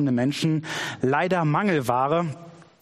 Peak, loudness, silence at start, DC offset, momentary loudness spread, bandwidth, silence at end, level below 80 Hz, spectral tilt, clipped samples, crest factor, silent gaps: -8 dBFS; -24 LUFS; 0 s; under 0.1%; 7 LU; 13 kHz; 0.2 s; -64 dBFS; -6 dB/octave; under 0.1%; 16 dB; none